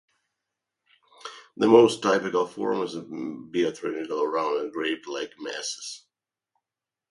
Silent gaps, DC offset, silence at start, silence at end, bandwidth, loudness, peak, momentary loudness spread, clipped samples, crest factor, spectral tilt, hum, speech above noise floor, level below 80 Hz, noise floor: none; under 0.1%; 1.25 s; 1.15 s; 11.5 kHz; -25 LUFS; -2 dBFS; 20 LU; under 0.1%; 24 dB; -4.5 dB/octave; none; 65 dB; -72 dBFS; -90 dBFS